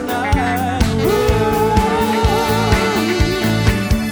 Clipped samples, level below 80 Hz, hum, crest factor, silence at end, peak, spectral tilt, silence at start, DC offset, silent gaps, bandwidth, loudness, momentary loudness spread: under 0.1%; -24 dBFS; none; 14 dB; 0 s; -2 dBFS; -5.5 dB/octave; 0 s; under 0.1%; none; over 20 kHz; -16 LUFS; 2 LU